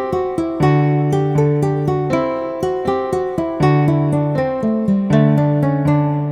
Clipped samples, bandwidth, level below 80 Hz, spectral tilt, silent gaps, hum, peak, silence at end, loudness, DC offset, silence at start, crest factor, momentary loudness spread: under 0.1%; 9.8 kHz; -44 dBFS; -9 dB/octave; none; none; -2 dBFS; 0 s; -17 LUFS; under 0.1%; 0 s; 14 dB; 6 LU